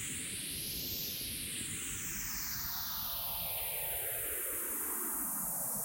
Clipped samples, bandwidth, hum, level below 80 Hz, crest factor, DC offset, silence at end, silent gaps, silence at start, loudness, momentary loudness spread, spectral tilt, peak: under 0.1%; 16.5 kHz; none; -58 dBFS; 14 dB; under 0.1%; 0 s; none; 0 s; -36 LUFS; 3 LU; -1 dB/octave; -24 dBFS